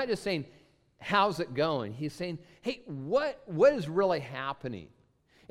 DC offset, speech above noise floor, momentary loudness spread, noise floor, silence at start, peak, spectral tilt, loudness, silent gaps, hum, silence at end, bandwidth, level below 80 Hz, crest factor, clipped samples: under 0.1%; 34 dB; 14 LU; -65 dBFS; 0 s; -12 dBFS; -6 dB/octave; -31 LUFS; none; none; 0.65 s; 13.5 kHz; -64 dBFS; 20 dB; under 0.1%